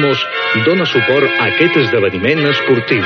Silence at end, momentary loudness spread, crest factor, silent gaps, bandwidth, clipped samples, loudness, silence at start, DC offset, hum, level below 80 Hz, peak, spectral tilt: 0 s; 3 LU; 12 dB; none; 6.6 kHz; under 0.1%; -12 LUFS; 0 s; under 0.1%; none; -58 dBFS; 0 dBFS; -6.5 dB/octave